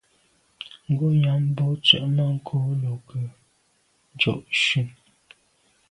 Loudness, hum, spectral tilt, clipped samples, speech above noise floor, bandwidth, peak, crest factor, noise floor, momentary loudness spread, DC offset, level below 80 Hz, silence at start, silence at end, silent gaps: -22 LUFS; none; -5.5 dB/octave; under 0.1%; 43 dB; 10.5 kHz; 0 dBFS; 24 dB; -66 dBFS; 17 LU; under 0.1%; -62 dBFS; 0.6 s; 1 s; none